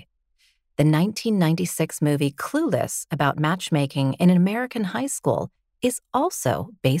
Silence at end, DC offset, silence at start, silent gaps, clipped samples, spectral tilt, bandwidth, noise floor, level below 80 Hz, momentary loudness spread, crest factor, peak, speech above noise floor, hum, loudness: 0 s; under 0.1%; 0.8 s; none; under 0.1%; -5.5 dB/octave; 16 kHz; -65 dBFS; -58 dBFS; 6 LU; 16 dB; -6 dBFS; 43 dB; none; -23 LUFS